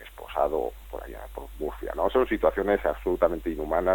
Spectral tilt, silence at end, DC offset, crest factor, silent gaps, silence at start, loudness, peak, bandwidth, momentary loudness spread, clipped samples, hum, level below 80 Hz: -6.5 dB/octave; 0 s; under 0.1%; 20 dB; none; 0 s; -27 LUFS; -6 dBFS; 17.5 kHz; 15 LU; under 0.1%; none; -42 dBFS